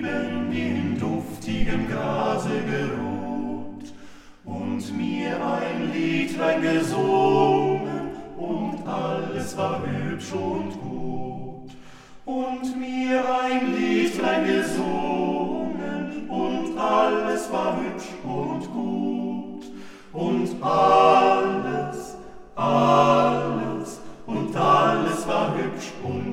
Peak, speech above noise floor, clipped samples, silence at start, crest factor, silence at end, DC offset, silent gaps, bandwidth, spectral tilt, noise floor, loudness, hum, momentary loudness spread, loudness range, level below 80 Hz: -4 dBFS; 22 dB; under 0.1%; 0 s; 20 dB; 0 s; under 0.1%; none; 15.5 kHz; -6 dB/octave; -44 dBFS; -24 LUFS; none; 15 LU; 8 LU; -46 dBFS